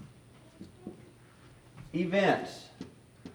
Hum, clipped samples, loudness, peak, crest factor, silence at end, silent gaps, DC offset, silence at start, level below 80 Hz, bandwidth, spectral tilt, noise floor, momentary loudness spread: none; under 0.1%; -30 LUFS; -12 dBFS; 24 dB; 0 s; none; under 0.1%; 0 s; -66 dBFS; over 20 kHz; -6 dB/octave; -56 dBFS; 26 LU